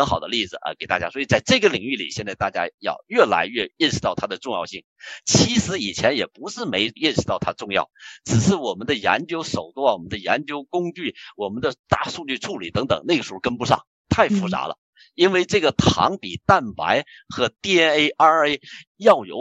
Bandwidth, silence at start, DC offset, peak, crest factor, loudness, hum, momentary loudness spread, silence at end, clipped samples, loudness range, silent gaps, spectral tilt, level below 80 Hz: 9.2 kHz; 0 s; under 0.1%; -2 dBFS; 20 dB; -21 LUFS; none; 11 LU; 0 s; under 0.1%; 5 LU; 2.74-2.78 s, 4.84-4.96 s, 11.79-11.84 s, 13.87-14.05 s, 14.78-14.93 s, 18.87-18.95 s; -4 dB/octave; -50 dBFS